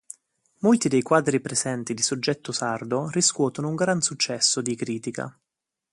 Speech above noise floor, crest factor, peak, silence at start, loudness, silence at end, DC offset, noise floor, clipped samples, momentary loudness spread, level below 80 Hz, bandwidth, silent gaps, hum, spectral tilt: 61 dB; 20 dB; -6 dBFS; 0.6 s; -24 LUFS; 0.6 s; under 0.1%; -85 dBFS; under 0.1%; 10 LU; -68 dBFS; 11.5 kHz; none; none; -3.5 dB/octave